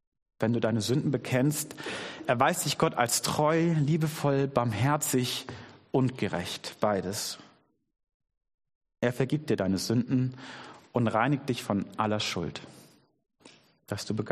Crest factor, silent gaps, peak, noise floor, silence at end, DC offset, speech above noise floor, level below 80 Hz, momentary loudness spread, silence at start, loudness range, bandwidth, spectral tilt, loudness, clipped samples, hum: 22 dB; 8.14-8.20 s, 8.54-8.58 s, 8.75-8.81 s; -8 dBFS; -64 dBFS; 0 s; under 0.1%; 36 dB; -64 dBFS; 10 LU; 0.4 s; 6 LU; 15 kHz; -5 dB/octave; -29 LUFS; under 0.1%; none